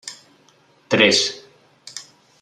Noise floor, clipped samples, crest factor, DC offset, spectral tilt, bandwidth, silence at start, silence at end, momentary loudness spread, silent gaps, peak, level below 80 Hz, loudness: -56 dBFS; under 0.1%; 22 dB; under 0.1%; -2.5 dB/octave; 13 kHz; 0.05 s; 0.4 s; 23 LU; none; -2 dBFS; -68 dBFS; -16 LUFS